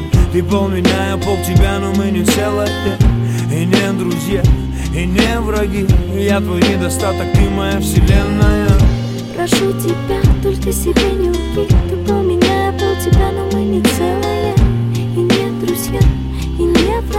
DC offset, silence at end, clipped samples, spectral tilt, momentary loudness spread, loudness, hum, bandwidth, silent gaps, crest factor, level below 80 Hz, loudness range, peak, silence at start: 0.5%; 0 s; under 0.1%; -6 dB/octave; 4 LU; -15 LUFS; none; 16.5 kHz; none; 14 dB; -20 dBFS; 1 LU; 0 dBFS; 0 s